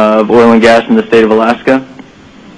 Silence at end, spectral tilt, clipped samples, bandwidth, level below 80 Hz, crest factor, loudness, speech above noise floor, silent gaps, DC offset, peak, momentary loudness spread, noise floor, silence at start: 0.55 s; -6 dB/octave; 0.6%; 10.5 kHz; -42 dBFS; 8 dB; -7 LUFS; 28 dB; none; under 0.1%; 0 dBFS; 7 LU; -35 dBFS; 0 s